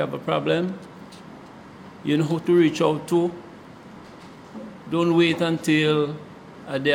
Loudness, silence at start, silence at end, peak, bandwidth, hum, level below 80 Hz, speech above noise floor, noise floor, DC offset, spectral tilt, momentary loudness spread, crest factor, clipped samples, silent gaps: -22 LUFS; 0 s; 0 s; -6 dBFS; 14.5 kHz; none; -64 dBFS; 22 dB; -43 dBFS; under 0.1%; -6 dB/octave; 24 LU; 18 dB; under 0.1%; none